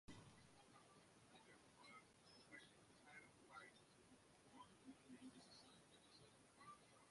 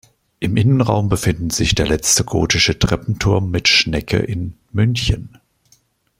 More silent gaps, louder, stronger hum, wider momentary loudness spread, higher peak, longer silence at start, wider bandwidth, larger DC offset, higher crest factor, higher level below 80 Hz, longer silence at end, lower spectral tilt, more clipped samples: neither; second, -66 LUFS vs -17 LUFS; neither; about the same, 6 LU vs 8 LU; second, -48 dBFS vs 0 dBFS; second, 0.05 s vs 0.4 s; second, 11.5 kHz vs 16 kHz; neither; about the same, 20 dB vs 16 dB; second, -86 dBFS vs -34 dBFS; second, 0 s vs 0.9 s; about the same, -3.5 dB/octave vs -4 dB/octave; neither